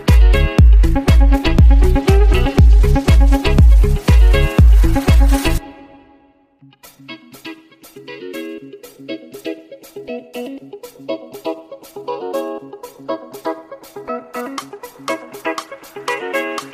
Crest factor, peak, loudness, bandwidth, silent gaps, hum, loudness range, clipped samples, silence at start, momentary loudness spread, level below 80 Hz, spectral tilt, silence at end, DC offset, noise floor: 12 dB; -2 dBFS; -14 LUFS; 14.5 kHz; none; none; 19 LU; under 0.1%; 0 s; 22 LU; -14 dBFS; -6.5 dB/octave; 0.05 s; under 0.1%; -52 dBFS